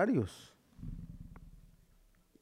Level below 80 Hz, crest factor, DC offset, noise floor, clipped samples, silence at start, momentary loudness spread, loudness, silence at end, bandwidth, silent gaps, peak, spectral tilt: -56 dBFS; 20 dB; under 0.1%; -67 dBFS; under 0.1%; 0 s; 24 LU; -40 LUFS; 0.75 s; 15 kHz; none; -20 dBFS; -7.5 dB/octave